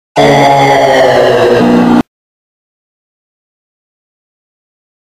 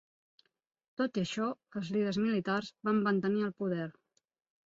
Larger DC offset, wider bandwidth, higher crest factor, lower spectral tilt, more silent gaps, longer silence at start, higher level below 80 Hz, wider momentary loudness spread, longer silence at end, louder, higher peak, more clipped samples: neither; first, 16 kHz vs 7.8 kHz; second, 10 dB vs 16 dB; about the same, -5.5 dB/octave vs -6.5 dB/octave; neither; second, 0.15 s vs 1 s; first, -42 dBFS vs -74 dBFS; second, 4 LU vs 8 LU; first, 3.1 s vs 0.75 s; first, -7 LUFS vs -33 LUFS; first, 0 dBFS vs -18 dBFS; first, 0.4% vs under 0.1%